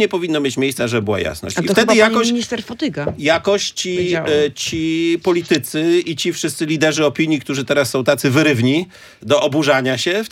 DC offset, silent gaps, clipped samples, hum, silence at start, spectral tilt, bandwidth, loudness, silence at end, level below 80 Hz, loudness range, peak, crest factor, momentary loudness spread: under 0.1%; none; under 0.1%; none; 0 s; -4.5 dB/octave; 16.5 kHz; -17 LUFS; 0.05 s; -54 dBFS; 2 LU; 0 dBFS; 16 dB; 7 LU